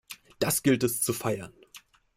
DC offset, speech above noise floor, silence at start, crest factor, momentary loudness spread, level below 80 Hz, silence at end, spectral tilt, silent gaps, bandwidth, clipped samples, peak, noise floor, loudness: under 0.1%; 27 dB; 0.1 s; 18 dB; 17 LU; -62 dBFS; 0.4 s; -4 dB/octave; none; 16 kHz; under 0.1%; -12 dBFS; -54 dBFS; -27 LUFS